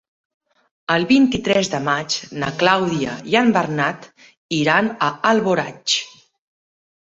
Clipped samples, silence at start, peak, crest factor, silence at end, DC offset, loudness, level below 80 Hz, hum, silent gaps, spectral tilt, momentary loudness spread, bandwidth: under 0.1%; 0.9 s; -2 dBFS; 18 dB; 0.9 s; under 0.1%; -18 LUFS; -56 dBFS; none; 4.37-4.49 s; -4 dB/octave; 9 LU; 7.8 kHz